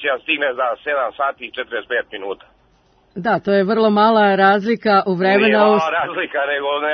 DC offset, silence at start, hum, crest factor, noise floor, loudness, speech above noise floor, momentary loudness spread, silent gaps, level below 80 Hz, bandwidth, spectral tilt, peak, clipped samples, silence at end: under 0.1%; 0 s; none; 16 dB; -56 dBFS; -17 LUFS; 39 dB; 13 LU; none; -62 dBFS; 6.4 kHz; -7 dB/octave; -2 dBFS; under 0.1%; 0 s